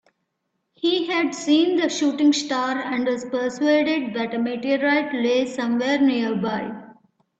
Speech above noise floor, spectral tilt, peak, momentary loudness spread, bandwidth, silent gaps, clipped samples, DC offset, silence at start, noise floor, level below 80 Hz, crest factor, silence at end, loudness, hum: 55 dB; -4 dB/octave; -8 dBFS; 7 LU; 8.2 kHz; none; under 0.1%; under 0.1%; 0.85 s; -76 dBFS; -68 dBFS; 14 dB; 0.45 s; -22 LUFS; none